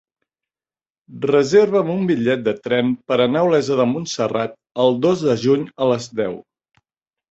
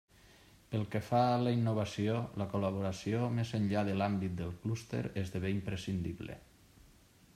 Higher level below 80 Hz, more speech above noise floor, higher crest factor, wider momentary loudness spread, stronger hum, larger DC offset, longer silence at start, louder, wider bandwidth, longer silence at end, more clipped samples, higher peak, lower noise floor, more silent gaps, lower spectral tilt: about the same, -60 dBFS vs -64 dBFS; first, over 72 dB vs 28 dB; about the same, 16 dB vs 18 dB; about the same, 10 LU vs 9 LU; neither; neither; first, 1.1 s vs 0.7 s; first, -18 LUFS vs -35 LUFS; second, 8 kHz vs 14 kHz; about the same, 0.9 s vs 0.95 s; neither; first, -2 dBFS vs -18 dBFS; first, under -90 dBFS vs -62 dBFS; neither; about the same, -6 dB/octave vs -7 dB/octave